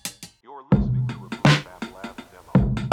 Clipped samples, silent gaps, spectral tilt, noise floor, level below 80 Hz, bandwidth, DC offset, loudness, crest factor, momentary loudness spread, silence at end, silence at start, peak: under 0.1%; none; -6 dB/octave; -43 dBFS; -36 dBFS; 15 kHz; under 0.1%; -22 LUFS; 16 dB; 21 LU; 0 s; 0.05 s; -8 dBFS